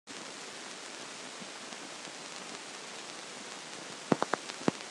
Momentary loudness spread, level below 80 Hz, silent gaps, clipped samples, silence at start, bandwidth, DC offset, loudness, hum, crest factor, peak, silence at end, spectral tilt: 10 LU; -82 dBFS; none; under 0.1%; 0.05 s; 12.5 kHz; under 0.1%; -39 LUFS; none; 30 dB; -10 dBFS; 0 s; -3 dB/octave